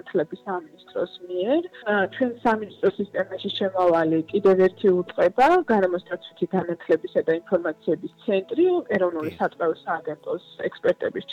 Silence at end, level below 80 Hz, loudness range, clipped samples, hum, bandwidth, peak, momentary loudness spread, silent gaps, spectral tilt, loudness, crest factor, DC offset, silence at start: 0 s; -62 dBFS; 5 LU; under 0.1%; none; 7.6 kHz; -10 dBFS; 11 LU; none; -7 dB/octave; -24 LUFS; 12 dB; under 0.1%; 0.05 s